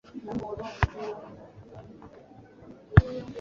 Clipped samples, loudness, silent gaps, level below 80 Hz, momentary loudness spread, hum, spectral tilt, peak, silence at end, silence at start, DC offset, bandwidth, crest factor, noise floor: under 0.1%; -28 LUFS; none; -38 dBFS; 27 LU; none; -7 dB/octave; -2 dBFS; 0 s; 0.15 s; under 0.1%; 7 kHz; 28 dB; -51 dBFS